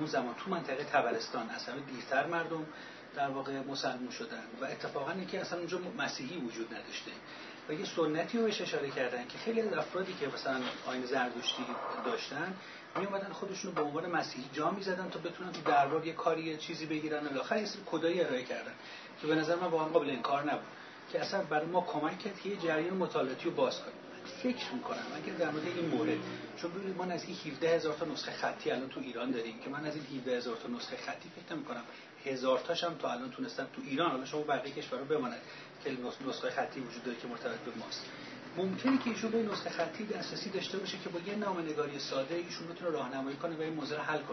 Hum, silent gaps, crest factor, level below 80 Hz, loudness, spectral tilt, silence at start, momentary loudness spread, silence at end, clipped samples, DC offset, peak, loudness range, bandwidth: none; none; 22 dB; -84 dBFS; -36 LUFS; -3 dB/octave; 0 s; 9 LU; 0 s; under 0.1%; under 0.1%; -14 dBFS; 4 LU; 6.2 kHz